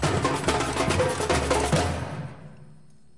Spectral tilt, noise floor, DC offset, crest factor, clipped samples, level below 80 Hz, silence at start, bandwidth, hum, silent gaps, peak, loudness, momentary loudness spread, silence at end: -4.5 dB/octave; -54 dBFS; 0.3%; 16 dB; under 0.1%; -40 dBFS; 0 s; 11.5 kHz; none; none; -10 dBFS; -25 LUFS; 13 LU; 0.45 s